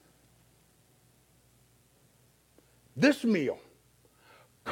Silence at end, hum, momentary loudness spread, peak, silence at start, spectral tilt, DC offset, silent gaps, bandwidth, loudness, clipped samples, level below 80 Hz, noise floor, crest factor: 0 s; none; 19 LU; -12 dBFS; 2.95 s; -5.5 dB/octave; under 0.1%; none; 16.5 kHz; -29 LUFS; under 0.1%; -74 dBFS; -65 dBFS; 24 dB